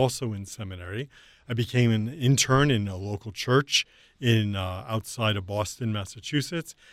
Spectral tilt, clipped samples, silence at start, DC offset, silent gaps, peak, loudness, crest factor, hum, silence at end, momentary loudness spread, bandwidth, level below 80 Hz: -4.5 dB/octave; under 0.1%; 0 s; under 0.1%; none; -8 dBFS; -26 LUFS; 18 dB; none; 0.2 s; 14 LU; 15.5 kHz; -54 dBFS